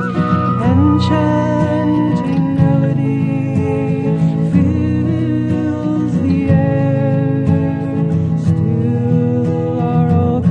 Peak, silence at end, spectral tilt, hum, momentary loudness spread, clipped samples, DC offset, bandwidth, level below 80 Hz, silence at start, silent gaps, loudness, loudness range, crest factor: 0 dBFS; 0 s; -9.5 dB/octave; none; 4 LU; under 0.1%; under 0.1%; 8.4 kHz; -32 dBFS; 0 s; none; -15 LUFS; 1 LU; 14 dB